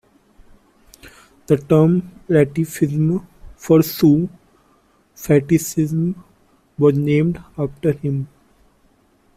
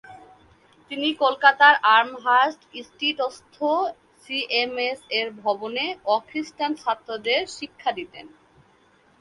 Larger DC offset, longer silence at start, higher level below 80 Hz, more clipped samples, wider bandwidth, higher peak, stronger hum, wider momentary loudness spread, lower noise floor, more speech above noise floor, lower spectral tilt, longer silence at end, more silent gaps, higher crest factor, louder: neither; first, 1.05 s vs 0.1 s; first, -50 dBFS vs -70 dBFS; neither; first, 16 kHz vs 11.5 kHz; about the same, -2 dBFS vs -2 dBFS; neither; about the same, 12 LU vs 14 LU; about the same, -57 dBFS vs -59 dBFS; first, 40 dB vs 36 dB; first, -7.5 dB/octave vs -2.5 dB/octave; first, 1.1 s vs 0.95 s; neither; second, 16 dB vs 22 dB; first, -18 LUFS vs -22 LUFS